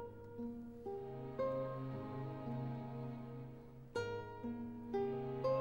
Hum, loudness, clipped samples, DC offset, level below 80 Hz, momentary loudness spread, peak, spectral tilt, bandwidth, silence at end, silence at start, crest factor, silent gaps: none; -45 LUFS; under 0.1%; under 0.1%; -68 dBFS; 9 LU; -28 dBFS; -8 dB/octave; 16 kHz; 0 s; 0 s; 16 dB; none